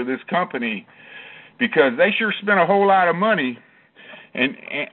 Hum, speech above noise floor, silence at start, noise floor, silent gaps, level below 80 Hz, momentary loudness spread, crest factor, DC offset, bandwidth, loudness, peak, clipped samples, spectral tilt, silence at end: none; 26 dB; 0 s; -45 dBFS; none; -68 dBFS; 18 LU; 18 dB; under 0.1%; 4.3 kHz; -19 LUFS; -2 dBFS; under 0.1%; -2.5 dB/octave; 0.05 s